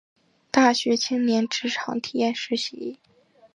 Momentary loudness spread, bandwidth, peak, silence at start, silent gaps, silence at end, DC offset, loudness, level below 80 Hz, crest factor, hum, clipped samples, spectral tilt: 10 LU; 11 kHz; -4 dBFS; 0.55 s; none; 0.6 s; under 0.1%; -23 LUFS; -74 dBFS; 20 dB; none; under 0.1%; -3 dB/octave